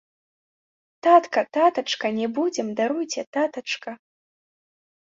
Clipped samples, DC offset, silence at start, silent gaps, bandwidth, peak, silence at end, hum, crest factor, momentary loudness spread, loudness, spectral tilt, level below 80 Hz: under 0.1%; under 0.1%; 1.05 s; 3.27-3.33 s; 7.8 kHz; -2 dBFS; 1.2 s; none; 22 dB; 12 LU; -23 LUFS; -3.5 dB/octave; -76 dBFS